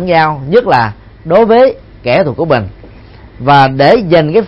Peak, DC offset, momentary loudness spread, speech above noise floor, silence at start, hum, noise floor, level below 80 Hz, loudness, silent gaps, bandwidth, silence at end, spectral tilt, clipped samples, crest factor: 0 dBFS; under 0.1%; 11 LU; 26 dB; 0 s; none; -34 dBFS; -38 dBFS; -9 LUFS; none; 7 kHz; 0 s; -8 dB/octave; 0.4%; 10 dB